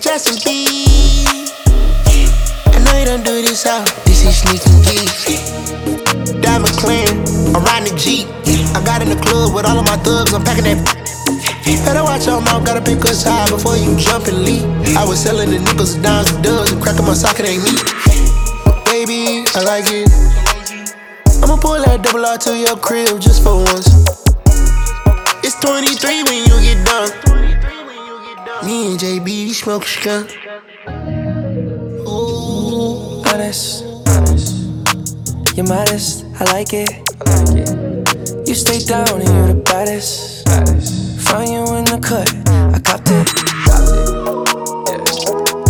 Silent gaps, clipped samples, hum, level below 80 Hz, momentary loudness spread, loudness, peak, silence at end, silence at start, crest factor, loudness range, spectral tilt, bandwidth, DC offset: none; under 0.1%; none; -16 dBFS; 8 LU; -13 LUFS; 0 dBFS; 0 s; 0 s; 12 dB; 6 LU; -4 dB/octave; over 20 kHz; under 0.1%